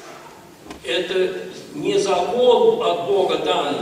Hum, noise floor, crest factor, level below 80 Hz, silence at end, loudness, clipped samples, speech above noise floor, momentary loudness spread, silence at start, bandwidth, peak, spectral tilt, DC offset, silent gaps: none; -42 dBFS; 16 dB; -60 dBFS; 0 s; -19 LUFS; under 0.1%; 23 dB; 18 LU; 0 s; 15 kHz; -4 dBFS; -4 dB/octave; under 0.1%; none